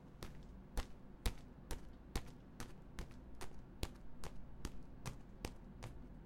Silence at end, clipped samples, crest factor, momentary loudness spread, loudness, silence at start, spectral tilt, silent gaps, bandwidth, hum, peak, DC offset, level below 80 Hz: 0 s; under 0.1%; 30 dB; 8 LU; -53 LUFS; 0 s; -4.5 dB/octave; none; 16.5 kHz; none; -18 dBFS; under 0.1%; -52 dBFS